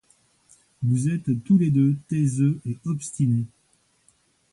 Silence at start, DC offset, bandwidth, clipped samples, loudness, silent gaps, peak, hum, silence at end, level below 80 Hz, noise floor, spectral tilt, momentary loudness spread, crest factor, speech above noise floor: 0.8 s; under 0.1%; 11.5 kHz; under 0.1%; -23 LUFS; none; -10 dBFS; none; 1.05 s; -60 dBFS; -65 dBFS; -8 dB/octave; 10 LU; 14 dB; 43 dB